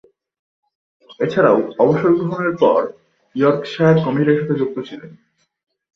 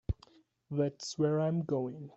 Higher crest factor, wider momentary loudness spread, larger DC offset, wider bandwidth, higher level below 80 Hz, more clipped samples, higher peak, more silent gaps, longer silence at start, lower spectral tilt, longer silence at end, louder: about the same, 18 dB vs 16 dB; first, 14 LU vs 10 LU; neither; second, 6.4 kHz vs 8.2 kHz; second, -58 dBFS vs -52 dBFS; neither; first, -2 dBFS vs -18 dBFS; neither; first, 1.1 s vs 0.1 s; first, -8.5 dB/octave vs -7 dB/octave; first, 0.8 s vs 0.05 s; first, -16 LUFS vs -34 LUFS